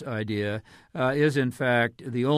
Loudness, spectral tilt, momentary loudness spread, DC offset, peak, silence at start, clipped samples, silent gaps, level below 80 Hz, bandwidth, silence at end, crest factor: -26 LUFS; -6.5 dB/octave; 9 LU; under 0.1%; -10 dBFS; 0 s; under 0.1%; none; -62 dBFS; 14.5 kHz; 0 s; 16 dB